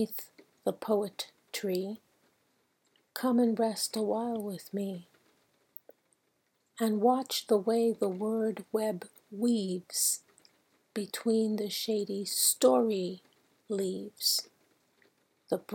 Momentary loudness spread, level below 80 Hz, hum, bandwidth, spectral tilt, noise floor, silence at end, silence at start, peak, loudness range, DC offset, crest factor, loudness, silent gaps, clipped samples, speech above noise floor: 15 LU; -86 dBFS; none; 18 kHz; -3.5 dB/octave; -76 dBFS; 0 s; 0 s; -12 dBFS; 5 LU; under 0.1%; 20 dB; -31 LUFS; none; under 0.1%; 45 dB